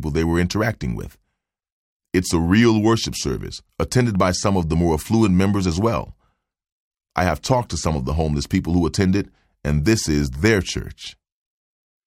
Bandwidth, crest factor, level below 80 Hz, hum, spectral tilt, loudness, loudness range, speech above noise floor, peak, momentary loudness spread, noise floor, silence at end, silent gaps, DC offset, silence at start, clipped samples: 16.5 kHz; 16 dB; -34 dBFS; none; -5.5 dB/octave; -20 LUFS; 3 LU; 58 dB; -4 dBFS; 12 LU; -77 dBFS; 0.95 s; 1.72-2.00 s, 6.72-6.91 s; under 0.1%; 0 s; under 0.1%